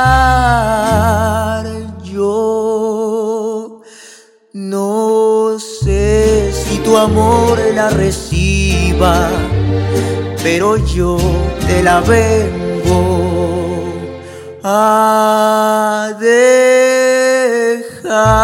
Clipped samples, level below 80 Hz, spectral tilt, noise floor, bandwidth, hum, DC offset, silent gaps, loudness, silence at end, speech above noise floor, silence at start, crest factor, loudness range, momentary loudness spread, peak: 0.1%; -24 dBFS; -5.5 dB/octave; -41 dBFS; 17 kHz; none; under 0.1%; none; -13 LUFS; 0 s; 31 dB; 0 s; 12 dB; 6 LU; 10 LU; 0 dBFS